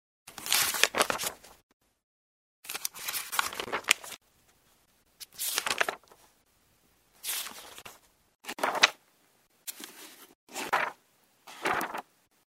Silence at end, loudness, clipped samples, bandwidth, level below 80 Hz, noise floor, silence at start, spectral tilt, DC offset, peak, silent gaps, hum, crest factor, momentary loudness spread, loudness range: 0.55 s; -30 LUFS; under 0.1%; 16 kHz; -72 dBFS; -68 dBFS; 0.25 s; 0.5 dB/octave; under 0.1%; 0 dBFS; 1.63-1.80 s, 2.03-2.63 s, 8.35-8.39 s, 10.35-10.47 s; none; 34 dB; 22 LU; 5 LU